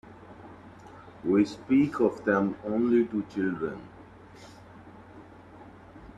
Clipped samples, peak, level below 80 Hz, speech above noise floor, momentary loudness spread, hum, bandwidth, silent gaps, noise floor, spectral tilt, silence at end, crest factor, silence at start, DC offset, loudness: under 0.1%; -12 dBFS; -62 dBFS; 23 dB; 25 LU; none; 9.2 kHz; none; -49 dBFS; -7.5 dB/octave; 0 s; 18 dB; 0.05 s; under 0.1%; -27 LUFS